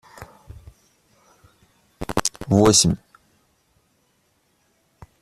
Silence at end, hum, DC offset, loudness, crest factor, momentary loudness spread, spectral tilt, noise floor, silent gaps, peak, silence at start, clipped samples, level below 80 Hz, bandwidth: 2.25 s; none; under 0.1%; -18 LUFS; 24 dB; 29 LU; -4 dB/octave; -66 dBFS; none; -2 dBFS; 0.2 s; under 0.1%; -48 dBFS; 14.5 kHz